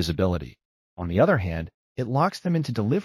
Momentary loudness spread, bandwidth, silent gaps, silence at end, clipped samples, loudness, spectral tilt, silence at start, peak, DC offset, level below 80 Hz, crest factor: 14 LU; 13 kHz; 0.65-0.97 s, 1.74-1.95 s; 0 s; under 0.1%; -25 LUFS; -7 dB/octave; 0 s; -8 dBFS; under 0.1%; -44 dBFS; 16 dB